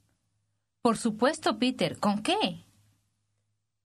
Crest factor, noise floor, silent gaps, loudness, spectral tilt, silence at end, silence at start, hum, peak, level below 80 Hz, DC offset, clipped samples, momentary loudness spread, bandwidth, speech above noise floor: 22 dB; -79 dBFS; none; -28 LUFS; -4.5 dB/octave; 1.25 s; 0.85 s; none; -10 dBFS; -68 dBFS; under 0.1%; under 0.1%; 3 LU; 13 kHz; 52 dB